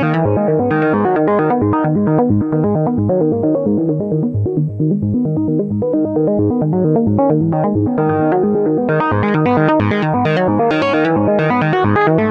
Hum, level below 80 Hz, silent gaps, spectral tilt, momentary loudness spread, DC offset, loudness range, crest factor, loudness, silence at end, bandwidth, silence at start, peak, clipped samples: none; -46 dBFS; none; -9.5 dB/octave; 3 LU; under 0.1%; 2 LU; 12 dB; -15 LUFS; 0 s; 6.2 kHz; 0 s; -2 dBFS; under 0.1%